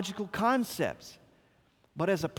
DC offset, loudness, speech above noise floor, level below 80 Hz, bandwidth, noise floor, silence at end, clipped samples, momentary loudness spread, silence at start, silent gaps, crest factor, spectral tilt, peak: under 0.1%; -31 LUFS; 36 dB; -66 dBFS; over 20 kHz; -67 dBFS; 0 s; under 0.1%; 21 LU; 0 s; none; 18 dB; -5 dB/octave; -14 dBFS